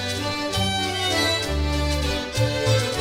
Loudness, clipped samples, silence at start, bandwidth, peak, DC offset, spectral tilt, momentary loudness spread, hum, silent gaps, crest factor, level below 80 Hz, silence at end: -22 LUFS; under 0.1%; 0 s; 16 kHz; -8 dBFS; under 0.1%; -4 dB/octave; 4 LU; none; none; 14 dB; -32 dBFS; 0 s